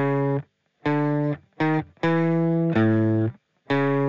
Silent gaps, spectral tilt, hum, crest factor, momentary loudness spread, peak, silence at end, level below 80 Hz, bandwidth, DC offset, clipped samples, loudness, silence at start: none; -9.5 dB/octave; none; 14 dB; 7 LU; -10 dBFS; 0 s; -60 dBFS; 7 kHz; 0.2%; under 0.1%; -23 LUFS; 0 s